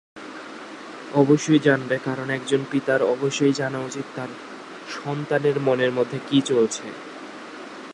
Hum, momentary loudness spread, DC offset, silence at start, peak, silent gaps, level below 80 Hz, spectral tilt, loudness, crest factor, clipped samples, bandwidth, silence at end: none; 19 LU; under 0.1%; 0.15 s; -4 dBFS; none; -72 dBFS; -5.5 dB/octave; -22 LUFS; 20 dB; under 0.1%; 11 kHz; 0 s